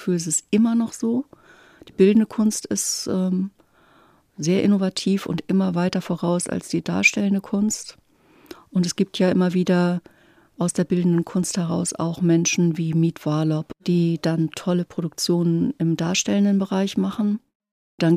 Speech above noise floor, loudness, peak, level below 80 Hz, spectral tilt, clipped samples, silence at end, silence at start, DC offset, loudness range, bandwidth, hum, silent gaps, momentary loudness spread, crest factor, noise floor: 35 dB; -22 LUFS; -2 dBFS; -62 dBFS; -5.5 dB/octave; under 0.1%; 0 s; 0 s; under 0.1%; 2 LU; 15 kHz; none; 17.55-17.60 s, 17.71-17.98 s; 7 LU; 20 dB; -56 dBFS